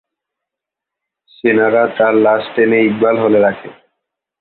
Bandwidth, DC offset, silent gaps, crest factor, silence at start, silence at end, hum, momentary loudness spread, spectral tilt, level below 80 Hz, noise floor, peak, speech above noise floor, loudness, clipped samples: 4.4 kHz; under 0.1%; none; 14 dB; 1.45 s; 0.7 s; none; 4 LU; -10.5 dB/octave; -60 dBFS; -83 dBFS; -2 dBFS; 71 dB; -13 LUFS; under 0.1%